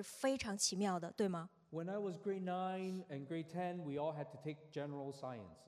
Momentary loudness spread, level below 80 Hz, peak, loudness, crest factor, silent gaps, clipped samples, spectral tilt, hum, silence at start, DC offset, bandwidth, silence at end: 10 LU; -78 dBFS; -24 dBFS; -42 LUFS; 20 dB; none; under 0.1%; -4.5 dB/octave; none; 0 s; under 0.1%; 14 kHz; 0 s